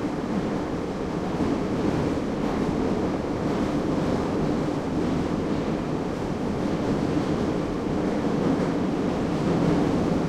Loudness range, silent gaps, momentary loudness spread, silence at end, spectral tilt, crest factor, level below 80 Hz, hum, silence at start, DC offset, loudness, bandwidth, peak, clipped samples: 2 LU; none; 4 LU; 0 s; -7.5 dB/octave; 14 dB; -42 dBFS; none; 0 s; under 0.1%; -26 LUFS; 12.5 kHz; -10 dBFS; under 0.1%